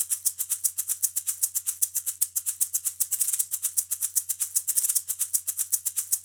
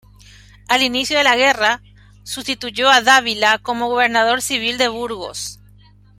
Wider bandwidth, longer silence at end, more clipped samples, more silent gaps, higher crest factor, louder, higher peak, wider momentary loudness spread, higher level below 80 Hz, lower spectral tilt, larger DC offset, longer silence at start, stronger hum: first, over 20 kHz vs 16 kHz; second, 0 s vs 0.65 s; neither; neither; about the same, 22 dB vs 18 dB; second, -25 LUFS vs -16 LUFS; second, -6 dBFS vs 0 dBFS; second, 2 LU vs 13 LU; second, -80 dBFS vs -50 dBFS; second, 4 dB/octave vs -1 dB/octave; neither; second, 0 s vs 0.7 s; second, none vs 50 Hz at -45 dBFS